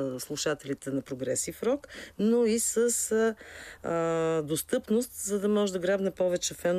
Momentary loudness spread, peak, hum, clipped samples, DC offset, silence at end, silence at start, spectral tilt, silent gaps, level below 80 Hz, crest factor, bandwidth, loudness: 8 LU; -14 dBFS; none; under 0.1%; under 0.1%; 0 s; 0 s; -4 dB/octave; none; -62 dBFS; 14 dB; 15.5 kHz; -29 LUFS